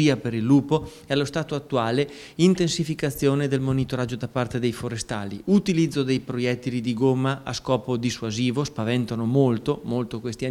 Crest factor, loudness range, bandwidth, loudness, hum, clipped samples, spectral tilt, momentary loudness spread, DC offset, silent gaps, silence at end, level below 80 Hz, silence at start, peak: 18 dB; 2 LU; 14.5 kHz; -24 LUFS; none; under 0.1%; -6 dB/octave; 8 LU; under 0.1%; none; 0 s; -52 dBFS; 0 s; -6 dBFS